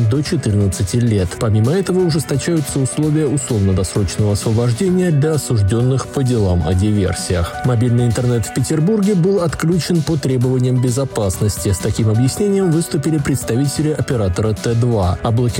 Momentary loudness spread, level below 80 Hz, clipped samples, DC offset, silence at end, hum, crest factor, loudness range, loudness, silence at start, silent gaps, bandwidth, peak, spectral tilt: 3 LU; -38 dBFS; under 0.1%; under 0.1%; 0 s; none; 10 dB; 1 LU; -16 LUFS; 0 s; none; 17 kHz; -6 dBFS; -6.5 dB/octave